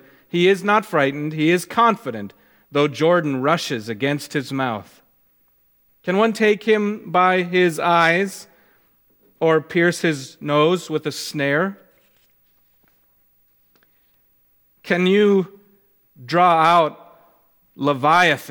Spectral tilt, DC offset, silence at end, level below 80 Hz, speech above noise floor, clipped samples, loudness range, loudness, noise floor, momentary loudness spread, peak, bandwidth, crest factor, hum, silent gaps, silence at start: -5.5 dB/octave; under 0.1%; 0 s; -70 dBFS; 42 dB; under 0.1%; 6 LU; -19 LUFS; -60 dBFS; 11 LU; -2 dBFS; 19 kHz; 18 dB; none; none; 0.35 s